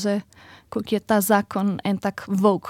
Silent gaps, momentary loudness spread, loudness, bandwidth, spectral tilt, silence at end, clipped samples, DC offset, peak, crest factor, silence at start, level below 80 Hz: none; 10 LU; -23 LUFS; 17 kHz; -5.5 dB/octave; 0 s; under 0.1%; under 0.1%; -4 dBFS; 18 dB; 0 s; -60 dBFS